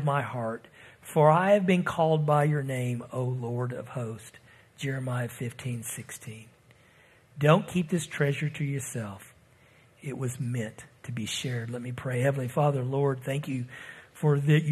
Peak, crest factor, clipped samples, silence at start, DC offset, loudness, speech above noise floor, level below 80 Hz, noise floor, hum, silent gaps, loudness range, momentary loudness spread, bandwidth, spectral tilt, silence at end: -6 dBFS; 22 dB; under 0.1%; 0 s; under 0.1%; -28 LUFS; 31 dB; -66 dBFS; -59 dBFS; none; none; 10 LU; 17 LU; 13.5 kHz; -6.5 dB/octave; 0 s